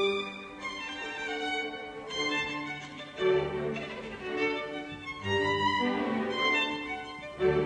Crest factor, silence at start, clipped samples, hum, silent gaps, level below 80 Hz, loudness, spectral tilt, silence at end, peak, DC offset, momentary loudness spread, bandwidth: 18 dB; 0 s; under 0.1%; none; none; -58 dBFS; -31 LUFS; -4.5 dB/octave; 0 s; -14 dBFS; under 0.1%; 12 LU; 10 kHz